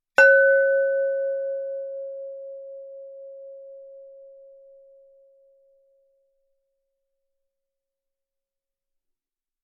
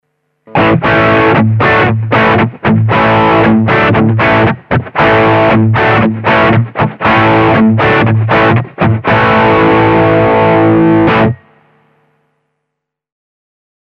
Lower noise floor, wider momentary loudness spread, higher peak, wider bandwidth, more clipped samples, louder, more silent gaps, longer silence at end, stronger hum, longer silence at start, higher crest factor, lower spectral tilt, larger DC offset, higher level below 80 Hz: first, -88 dBFS vs -74 dBFS; first, 27 LU vs 4 LU; about the same, -2 dBFS vs 0 dBFS; second, 3.8 kHz vs 6 kHz; neither; second, -20 LUFS vs -8 LUFS; neither; first, 5.6 s vs 2.55 s; neither; second, 0.2 s vs 0.5 s; first, 24 dB vs 8 dB; second, 9.5 dB/octave vs -8.5 dB/octave; neither; second, -76 dBFS vs -36 dBFS